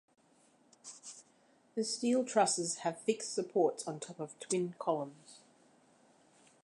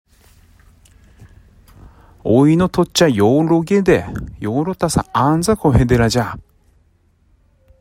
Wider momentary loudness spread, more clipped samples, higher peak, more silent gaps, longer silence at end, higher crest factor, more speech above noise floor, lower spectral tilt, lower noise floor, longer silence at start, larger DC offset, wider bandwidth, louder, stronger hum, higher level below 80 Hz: first, 20 LU vs 12 LU; neither; second, -16 dBFS vs 0 dBFS; neither; about the same, 1.3 s vs 1.4 s; about the same, 20 dB vs 16 dB; second, 34 dB vs 42 dB; second, -3.5 dB/octave vs -6 dB/octave; first, -68 dBFS vs -56 dBFS; second, 0.85 s vs 1.2 s; neither; second, 11 kHz vs 16 kHz; second, -35 LUFS vs -15 LUFS; neither; second, -88 dBFS vs -36 dBFS